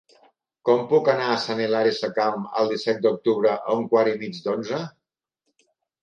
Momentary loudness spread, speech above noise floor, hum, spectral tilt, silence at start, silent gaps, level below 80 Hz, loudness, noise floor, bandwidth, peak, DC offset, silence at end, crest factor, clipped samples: 9 LU; 60 dB; none; -5.5 dB/octave; 0.65 s; none; -74 dBFS; -23 LUFS; -82 dBFS; 7.4 kHz; -6 dBFS; under 0.1%; 1.15 s; 18 dB; under 0.1%